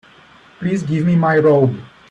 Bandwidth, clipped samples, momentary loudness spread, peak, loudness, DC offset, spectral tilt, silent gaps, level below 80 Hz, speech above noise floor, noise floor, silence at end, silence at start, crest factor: 8.4 kHz; under 0.1%; 12 LU; -2 dBFS; -16 LUFS; under 0.1%; -8.5 dB/octave; none; -54 dBFS; 31 dB; -46 dBFS; 0.25 s; 0.6 s; 14 dB